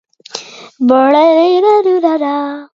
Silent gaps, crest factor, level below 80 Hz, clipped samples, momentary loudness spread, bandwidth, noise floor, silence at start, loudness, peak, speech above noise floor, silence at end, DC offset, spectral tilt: none; 12 dB; -66 dBFS; under 0.1%; 18 LU; 7.8 kHz; -30 dBFS; 0.35 s; -11 LUFS; 0 dBFS; 20 dB; 0.15 s; under 0.1%; -4 dB/octave